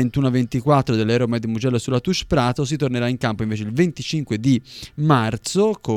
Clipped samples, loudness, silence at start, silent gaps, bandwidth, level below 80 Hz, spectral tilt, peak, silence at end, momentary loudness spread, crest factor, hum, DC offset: under 0.1%; -20 LUFS; 0 s; none; 14 kHz; -44 dBFS; -6 dB/octave; 0 dBFS; 0 s; 5 LU; 18 dB; none; under 0.1%